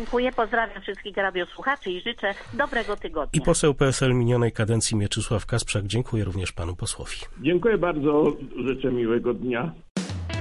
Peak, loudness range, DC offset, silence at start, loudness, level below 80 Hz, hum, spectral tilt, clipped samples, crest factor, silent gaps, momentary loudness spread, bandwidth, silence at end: -8 dBFS; 3 LU; under 0.1%; 0 s; -25 LUFS; -40 dBFS; none; -5 dB/octave; under 0.1%; 16 dB; 9.90-9.95 s; 9 LU; 11.5 kHz; 0 s